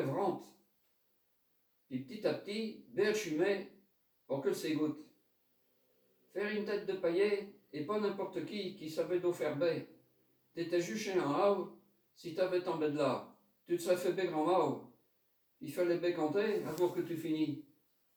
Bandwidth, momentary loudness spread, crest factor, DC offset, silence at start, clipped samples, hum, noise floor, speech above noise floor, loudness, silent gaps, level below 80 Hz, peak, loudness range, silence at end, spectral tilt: over 20 kHz; 12 LU; 18 dB; under 0.1%; 0 s; under 0.1%; none; -77 dBFS; 42 dB; -36 LUFS; none; -84 dBFS; -20 dBFS; 3 LU; 0.55 s; -5.5 dB/octave